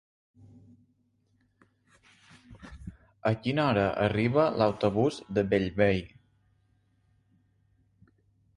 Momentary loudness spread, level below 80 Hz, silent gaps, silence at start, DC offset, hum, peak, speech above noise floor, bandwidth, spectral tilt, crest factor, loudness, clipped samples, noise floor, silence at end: 22 LU; -54 dBFS; none; 2.5 s; under 0.1%; none; -10 dBFS; 44 dB; 11 kHz; -7.5 dB/octave; 22 dB; -27 LUFS; under 0.1%; -71 dBFS; 2.5 s